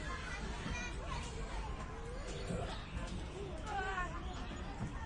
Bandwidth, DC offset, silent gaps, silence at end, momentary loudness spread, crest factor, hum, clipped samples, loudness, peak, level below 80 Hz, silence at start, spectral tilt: 11 kHz; under 0.1%; none; 0 s; 5 LU; 14 dB; none; under 0.1%; -43 LUFS; -28 dBFS; -46 dBFS; 0 s; -5 dB/octave